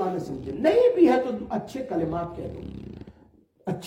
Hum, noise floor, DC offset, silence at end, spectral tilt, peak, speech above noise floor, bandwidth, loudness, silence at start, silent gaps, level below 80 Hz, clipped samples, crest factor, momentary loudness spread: none; -57 dBFS; under 0.1%; 0 s; -7.5 dB/octave; -8 dBFS; 33 dB; 10.5 kHz; -24 LUFS; 0 s; none; -52 dBFS; under 0.1%; 18 dB; 20 LU